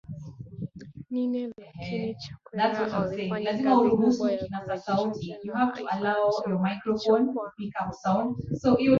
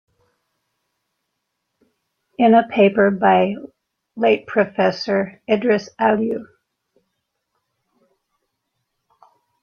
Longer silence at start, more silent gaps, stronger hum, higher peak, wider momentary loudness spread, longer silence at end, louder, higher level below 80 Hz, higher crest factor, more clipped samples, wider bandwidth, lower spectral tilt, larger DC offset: second, 0.1 s vs 2.4 s; neither; neither; second, -8 dBFS vs -2 dBFS; first, 16 LU vs 9 LU; second, 0 s vs 3.2 s; second, -27 LUFS vs -18 LUFS; first, -58 dBFS vs -64 dBFS; about the same, 18 dB vs 18 dB; neither; about the same, 7.2 kHz vs 6.8 kHz; about the same, -7 dB/octave vs -7 dB/octave; neither